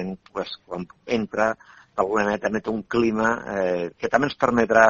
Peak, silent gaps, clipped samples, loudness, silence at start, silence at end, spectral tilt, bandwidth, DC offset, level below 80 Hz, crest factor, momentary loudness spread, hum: 0 dBFS; none; under 0.1%; -24 LUFS; 0 s; 0 s; -5.5 dB/octave; 7.6 kHz; under 0.1%; -54 dBFS; 22 dB; 12 LU; none